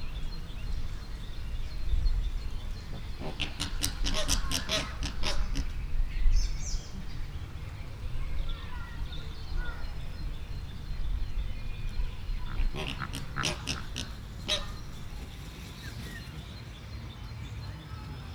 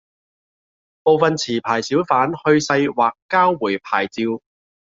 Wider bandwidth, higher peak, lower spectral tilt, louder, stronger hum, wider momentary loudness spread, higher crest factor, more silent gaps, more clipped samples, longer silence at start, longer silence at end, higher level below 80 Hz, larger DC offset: first, 15.5 kHz vs 7.8 kHz; second, -6 dBFS vs 0 dBFS; second, -3.5 dB/octave vs -5 dB/octave; second, -37 LUFS vs -18 LUFS; neither; first, 11 LU vs 6 LU; first, 26 dB vs 18 dB; second, none vs 3.22-3.29 s; neither; second, 0 s vs 1.05 s; second, 0 s vs 0.45 s; first, -34 dBFS vs -62 dBFS; neither